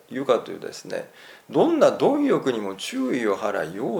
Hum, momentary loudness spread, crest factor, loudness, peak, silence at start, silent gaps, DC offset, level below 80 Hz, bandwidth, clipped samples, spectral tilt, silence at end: none; 15 LU; 20 dB; -23 LUFS; -4 dBFS; 0.1 s; none; under 0.1%; -74 dBFS; 19 kHz; under 0.1%; -5.5 dB/octave; 0 s